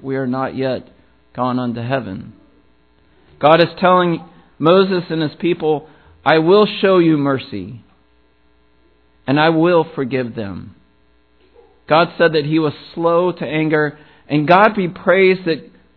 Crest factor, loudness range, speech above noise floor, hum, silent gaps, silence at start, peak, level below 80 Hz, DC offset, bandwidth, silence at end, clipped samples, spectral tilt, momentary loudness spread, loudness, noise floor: 16 dB; 4 LU; 41 dB; none; none; 0 s; 0 dBFS; -56 dBFS; 0.1%; 5.4 kHz; 0.3 s; under 0.1%; -9.5 dB/octave; 13 LU; -16 LUFS; -57 dBFS